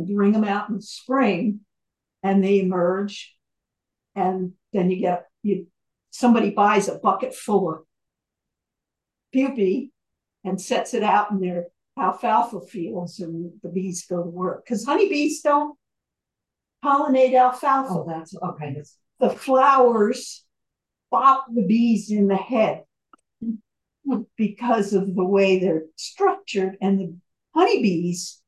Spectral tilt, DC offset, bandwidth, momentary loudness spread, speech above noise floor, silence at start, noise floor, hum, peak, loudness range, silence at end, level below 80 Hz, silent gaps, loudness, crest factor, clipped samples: -6 dB/octave; under 0.1%; 12.5 kHz; 14 LU; 64 dB; 0 s; -85 dBFS; none; -4 dBFS; 6 LU; 0.15 s; -74 dBFS; none; -22 LUFS; 18 dB; under 0.1%